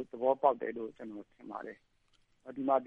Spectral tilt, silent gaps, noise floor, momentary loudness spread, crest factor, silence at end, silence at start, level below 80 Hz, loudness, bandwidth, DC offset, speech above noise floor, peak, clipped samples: -8 dB/octave; none; -71 dBFS; 20 LU; 22 dB; 0 s; 0 s; -76 dBFS; -34 LUFS; 4.6 kHz; under 0.1%; 37 dB; -12 dBFS; under 0.1%